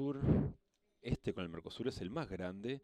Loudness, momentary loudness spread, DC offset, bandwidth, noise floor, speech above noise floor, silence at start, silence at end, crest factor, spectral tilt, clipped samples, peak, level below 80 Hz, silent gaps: -40 LUFS; 10 LU; under 0.1%; 11 kHz; -71 dBFS; 29 dB; 0 s; 0.05 s; 20 dB; -8 dB/octave; under 0.1%; -18 dBFS; -52 dBFS; none